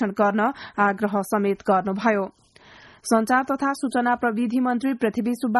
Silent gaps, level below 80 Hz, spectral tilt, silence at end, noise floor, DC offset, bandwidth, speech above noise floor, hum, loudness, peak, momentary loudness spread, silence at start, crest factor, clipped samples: none; -62 dBFS; -5.5 dB/octave; 0 s; -49 dBFS; under 0.1%; 12.5 kHz; 27 dB; none; -23 LUFS; -6 dBFS; 4 LU; 0 s; 16 dB; under 0.1%